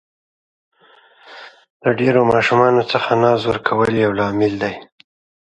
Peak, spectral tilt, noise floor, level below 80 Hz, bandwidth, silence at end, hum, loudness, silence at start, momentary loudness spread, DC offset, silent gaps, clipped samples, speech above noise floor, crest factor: 0 dBFS; -6.5 dB/octave; -51 dBFS; -52 dBFS; 10.5 kHz; 0.65 s; none; -16 LUFS; 1.3 s; 10 LU; under 0.1%; 1.70-1.80 s; under 0.1%; 35 dB; 18 dB